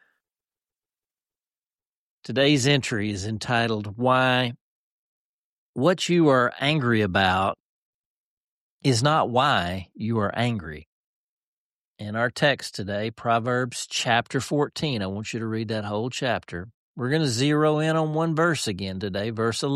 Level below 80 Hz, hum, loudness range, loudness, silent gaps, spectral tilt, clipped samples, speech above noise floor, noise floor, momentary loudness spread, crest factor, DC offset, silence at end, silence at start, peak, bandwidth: -58 dBFS; none; 4 LU; -24 LUFS; 4.61-5.74 s, 7.60-8.80 s, 10.86-11.96 s, 16.74-16.95 s; -5 dB/octave; under 0.1%; over 66 dB; under -90 dBFS; 10 LU; 18 dB; under 0.1%; 0 s; 2.25 s; -6 dBFS; 13 kHz